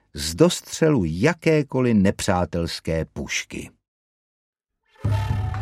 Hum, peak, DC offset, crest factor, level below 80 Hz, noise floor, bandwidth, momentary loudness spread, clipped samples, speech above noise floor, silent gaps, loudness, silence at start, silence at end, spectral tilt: none; -2 dBFS; under 0.1%; 20 dB; -40 dBFS; -56 dBFS; 16 kHz; 9 LU; under 0.1%; 35 dB; 3.88-4.53 s; -22 LUFS; 0.15 s; 0 s; -5.5 dB/octave